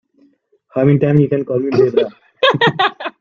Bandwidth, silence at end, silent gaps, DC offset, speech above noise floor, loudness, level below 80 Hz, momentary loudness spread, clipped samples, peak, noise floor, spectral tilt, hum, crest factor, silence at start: 7 kHz; 0.1 s; none; under 0.1%; 42 dB; -15 LUFS; -54 dBFS; 6 LU; under 0.1%; 0 dBFS; -55 dBFS; -7.5 dB/octave; none; 14 dB; 0.75 s